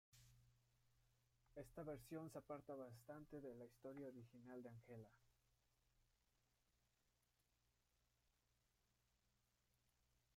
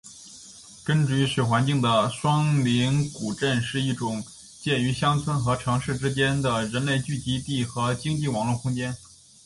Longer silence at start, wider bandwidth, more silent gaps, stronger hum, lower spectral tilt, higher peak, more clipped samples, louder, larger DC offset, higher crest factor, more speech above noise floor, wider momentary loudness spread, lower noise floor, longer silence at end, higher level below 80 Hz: about the same, 0.1 s vs 0.05 s; first, 16 kHz vs 11.5 kHz; neither; neither; first, -7 dB/octave vs -5.5 dB/octave; second, -42 dBFS vs -8 dBFS; neither; second, -58 LUFS vs -25 LUFS; neither; about the same, 20 dB vs 16 dB; first, 29 dB vs 22 dB; second, 8 LU vs 11 LU; first, -87 dBFS vs -46 dBFS; first, 4.35 s vs 0.4 s; second, -82 dBFS vs -52 dBFS